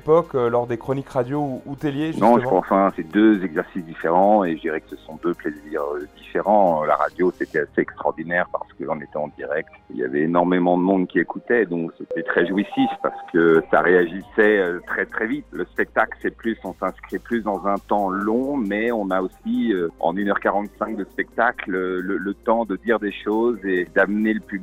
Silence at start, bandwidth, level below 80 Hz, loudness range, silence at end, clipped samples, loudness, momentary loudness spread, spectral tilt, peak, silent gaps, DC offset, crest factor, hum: 0.05 s; 15.5 kHz; -52 dBFS; 4 LU; 0 s; under 0.1%; -21 LUFS; 11 LU; -8 dB/octave; -2 dBFS; none; under 0.1%; 20 dB; none